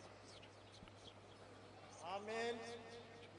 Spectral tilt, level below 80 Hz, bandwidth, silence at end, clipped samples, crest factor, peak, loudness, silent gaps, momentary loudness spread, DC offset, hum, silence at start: -4 dB/octave; -78 dBFS; 10 kHz; 0 s; under 0.1%; 20 dB; -32 dBFS; -52 LUFS; none; 15 LU; under 0.1%; none; 0 s